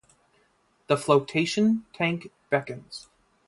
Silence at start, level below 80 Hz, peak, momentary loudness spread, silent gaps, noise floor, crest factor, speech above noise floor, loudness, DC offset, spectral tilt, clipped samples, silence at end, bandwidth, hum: 0.9 s; -66 dBFS; -6 dBFS; 17 LU; none; -66 dBFS; 22 dB; 41 dB; -25 LUFS; under 0.1%; -5.5 dB/octave; under 0.1%; 0.45 s; 11.5 kHz; none